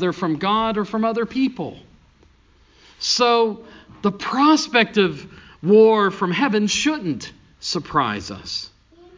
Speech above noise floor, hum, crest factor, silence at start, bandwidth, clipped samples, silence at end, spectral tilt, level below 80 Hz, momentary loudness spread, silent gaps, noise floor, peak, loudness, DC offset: 35 dB; none; 20 dB; 0 s; 7.6 kHz; under 0.1%; 0.5 s; -4.5 dB/octave; -54 dBFS; 15 LU; none; -54 dBFS; 0 dBFS; -19 LUFS; under 0.1%